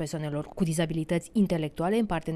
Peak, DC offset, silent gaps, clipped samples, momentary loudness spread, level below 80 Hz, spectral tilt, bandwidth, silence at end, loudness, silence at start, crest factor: -14 dBFS; under 0.1%; none; under 0.1%; 6 LU; -50 dBFS; -6.5 dB/octave; 14 kHz; 0 s; -28 LUFS; 0 s; 14 dB